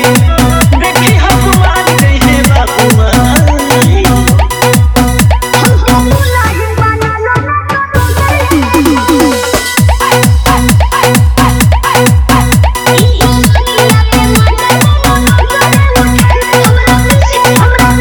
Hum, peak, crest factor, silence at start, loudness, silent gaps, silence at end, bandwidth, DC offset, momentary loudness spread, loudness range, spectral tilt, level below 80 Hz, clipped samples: none; 0 dBFS; 6 dB; 0 s; -7 LUFS; none; 0 s; over 20 kHz; under 0.1%; 3 LU; 2 LU; -5 dB/octave; -14 dBFS; 1%